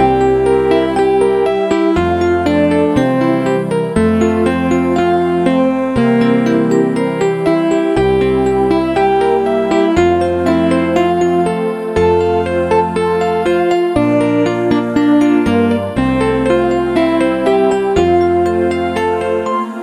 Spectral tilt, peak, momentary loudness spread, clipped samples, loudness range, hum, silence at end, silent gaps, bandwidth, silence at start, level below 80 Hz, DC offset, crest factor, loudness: -7 dB/octave; 0 dBFS; 3 LU; under 0.1%; 1 LU; none; 0 s; none; 11.5 kHz; 0 s; -36 dBFS; under 0.1%; 12 dB; -13 LUFS